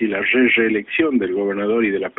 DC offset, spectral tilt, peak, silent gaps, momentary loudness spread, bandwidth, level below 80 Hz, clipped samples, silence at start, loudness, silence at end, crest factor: under 0.1%; -3 dB/octave; -4 dBFS; none; 6 LU; 4 kHz; -58 dBFS; under 0.1%; 0 s; -17 LUFS; 0.1 s; 14 dB